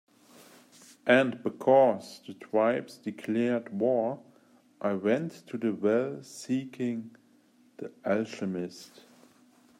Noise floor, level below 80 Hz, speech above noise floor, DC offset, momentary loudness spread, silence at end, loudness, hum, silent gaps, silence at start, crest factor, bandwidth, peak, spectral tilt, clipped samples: -63 dBFS; -80 dBFS; 34 dB; under 0.1%; 17 LU; 0.95 s; -29 LUFS; none; none; 1.05 s; 22 dB; 15 kHz; -8 dBFS; -6 dB/octave; under 0.1%